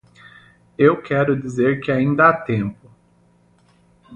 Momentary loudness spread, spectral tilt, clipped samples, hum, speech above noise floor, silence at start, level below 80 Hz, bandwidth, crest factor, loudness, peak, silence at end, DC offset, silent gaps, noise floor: 9 LU; -8 dB/octave; under 0.1%; none; 39 dB; 0.8 s; -54 dBFS; 9.2 kHz; 20 dB; -18 LUFS; -2 dBFS; 0 s; under 0.1%; none; -56 dBFS